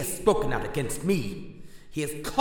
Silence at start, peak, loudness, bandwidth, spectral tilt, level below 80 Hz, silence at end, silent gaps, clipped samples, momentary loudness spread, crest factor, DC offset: 0 s; -6 dBFS; -28 LUFS; 19 kHz; -5 dB/octave; -42 dBFS; 0 s; none; under 0.1%; 14 LU; 22 dB; under 0.1%